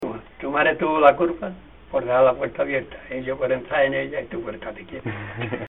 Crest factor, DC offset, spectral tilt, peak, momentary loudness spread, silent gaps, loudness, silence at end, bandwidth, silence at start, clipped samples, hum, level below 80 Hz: 22 dB; 0.2%; -8.5 dB/octave; 0 dBFS; 16 LU; none; -22 LUFS; 0 s; 4 kHz; 0 s; under 0.1%; none; -50 dBFS